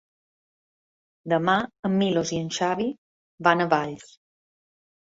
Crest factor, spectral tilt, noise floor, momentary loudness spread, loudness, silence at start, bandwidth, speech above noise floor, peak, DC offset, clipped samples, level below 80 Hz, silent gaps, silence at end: 22 dB; -5 dB/octave; under -90 dBFS; 13 LU; -24 LUFS; 1.25 s; 8 kHz; over 66 dB; -4 dBFS; under 0.1%; under 0.1%; -64 dBFS; 1.79-1.83 s, 2.98-3.38 s; 1.1 s